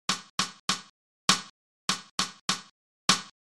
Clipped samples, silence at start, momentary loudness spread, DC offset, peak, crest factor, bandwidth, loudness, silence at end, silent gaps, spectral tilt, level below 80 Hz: under 0.1%; 0.1 s; 8 LU; under 0.1%; -6 dBFS; 26 dB; 16 kHz; -29 LUFS; 0.15 s; 0.30-0.38 s, 0.60-0.68 s, 0.90-1.28 s, 1.50-1.88 s, 2.11-2.18 s, 2.41-2.48 s, 2.71-3.08 s; -1 dB/octave; -66 dBFS